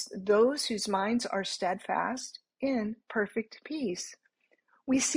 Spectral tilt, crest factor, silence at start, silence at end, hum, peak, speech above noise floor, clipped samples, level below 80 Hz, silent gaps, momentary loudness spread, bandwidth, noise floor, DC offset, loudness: -3 dB/octave; 16 dB; 0 s; 0 s; none; -14 dBFS; 41 dB; under 0.1%; -72 dBFS; none; 13 LU; 15.5 kHz; -71 dBFS; under 0.1%; -31 LUFS